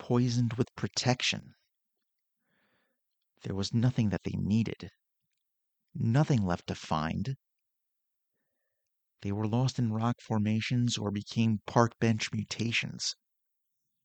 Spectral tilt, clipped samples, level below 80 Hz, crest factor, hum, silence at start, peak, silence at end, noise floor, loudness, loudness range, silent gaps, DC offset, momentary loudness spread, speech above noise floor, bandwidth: -5.5 dB/octave; under 0.1%; -62 dBFS; 24 dB; none; 0 s; -8 dBFS; 0.9 s; -84 dBFS; -31 LUFS; 5 LU; none; under 0.1%; 10 LU; 54 dB; 8.8 kHz